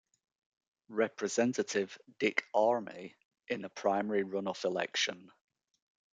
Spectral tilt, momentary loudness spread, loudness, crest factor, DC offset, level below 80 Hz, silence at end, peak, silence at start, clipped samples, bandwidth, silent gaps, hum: -3.5 dB/octave; 11 LU; -33 LUFS; 24 dB; under 0.1%; -84 dBFS; 0.85 s; -12 dBFS; 0.9 s; under 0.1%; 9.4 kHz; 3.25-3.31 s; none